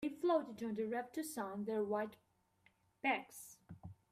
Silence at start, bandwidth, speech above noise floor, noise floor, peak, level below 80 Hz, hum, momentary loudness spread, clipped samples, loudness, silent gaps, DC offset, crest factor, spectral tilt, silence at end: 0 s; 15.5 kHz; 34 dB; -75 dBFS; -24 dBFS; -78 dBFS; none; 19 LU; under 0.1%; -40 LUFS; none; under 0.1%; 18 dB; -5 dB/octave; 0.2 s